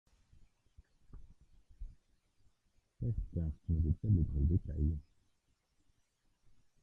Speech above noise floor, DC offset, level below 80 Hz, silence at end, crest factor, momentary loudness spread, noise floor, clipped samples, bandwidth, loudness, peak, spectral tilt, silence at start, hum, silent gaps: 43 dB; under 0.1%; -46 dBFS; 1.8 s; 20 dB; 24 LU; -77 dBFS; under 0.1%; 1.7 kHz; -36 LUFS; -20 dBFS; -12 dB/octave; 1.15 s; none; none